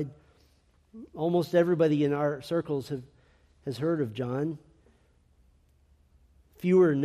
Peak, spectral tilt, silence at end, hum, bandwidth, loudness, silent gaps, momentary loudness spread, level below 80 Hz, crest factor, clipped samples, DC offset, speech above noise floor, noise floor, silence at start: -12 dBFS; -8 dB/octave; 0 s; none; 14 kHz; -28 LUFS; none; 16 LU; -64 dBFS; 18 dB; under 0.1%; under 0.1%; 38 dB; -64 dBFS; 0 s